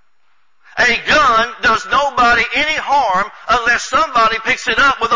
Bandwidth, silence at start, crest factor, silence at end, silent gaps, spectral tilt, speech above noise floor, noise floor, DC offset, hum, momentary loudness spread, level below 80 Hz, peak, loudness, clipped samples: 7.6 kHz; 0.75 s; 12 dB; 0 s; none; -2 dB/octave; 49 dB; -63 dBFS; 0.6%; none; 5 LU; -42 dBFS; -4 dBFS; -13 LUFS; under 0.1%